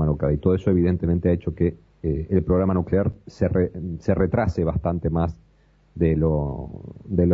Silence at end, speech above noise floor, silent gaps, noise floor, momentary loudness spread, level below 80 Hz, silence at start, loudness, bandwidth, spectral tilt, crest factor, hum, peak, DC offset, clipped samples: 0 s; 36 dB; none; -57 dBFS; 8 LU; -36 dBFS; 0 s; -23 LUFS; 6.8 kHz; -10.5 dB/octave; 16 dB; none; -6 dBFS; under 0.1%; under 0.1%